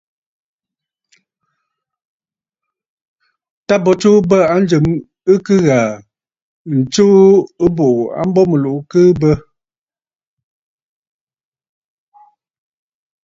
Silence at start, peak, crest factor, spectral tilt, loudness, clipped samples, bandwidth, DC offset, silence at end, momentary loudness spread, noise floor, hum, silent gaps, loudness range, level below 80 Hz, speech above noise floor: 3.7 s; 0 dBFS; 16 dB; -7 dB/octave; -12 LUFS; under 0.1%; 7.8 kHz; under 0.1%; 3.85 s; 8 LU; under -90 dBFS; none; 6.42-6.65 s; 6 LU; -46 dBFS; over 79 dB